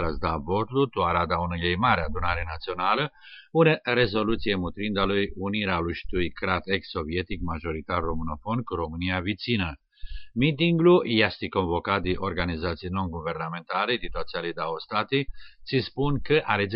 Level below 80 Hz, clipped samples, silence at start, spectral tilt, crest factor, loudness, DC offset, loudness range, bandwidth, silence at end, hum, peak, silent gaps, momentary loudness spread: -42 dBFS; under 0.1%; 0 s; -4 dB/octave; 20 dB; -26 LUFS; under 0.1%; 5 LU; 5.6 kHz; 0 s; none; -6 dBFS; none; 9 LU